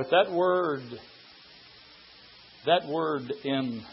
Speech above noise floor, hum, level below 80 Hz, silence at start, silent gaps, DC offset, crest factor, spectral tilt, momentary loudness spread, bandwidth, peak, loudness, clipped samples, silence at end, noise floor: 26 dB; none; -72 dBFS; 0 s; none; under 0.1%; 20 dB; -9 dB/octave; 25 LU; 5.8 kHz; -10 dBFS; -27 LUFS; under 0.1%; 0 s; -53 dBFS